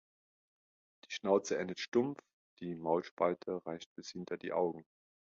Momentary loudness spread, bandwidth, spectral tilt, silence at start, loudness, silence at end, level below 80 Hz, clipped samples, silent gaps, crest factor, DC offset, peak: 14 LU; 7.4 kHz; -4.5 dB/octave; 1.1 s; -37 LUFS; 0.6 s; -78 dBFS; under 0.1%; 1.88-1.92 s, 2.33-2.57 s, 3.11-3.17 s, 3.86-3.96 s; 22 dB; under 0.1%; -16 dBFS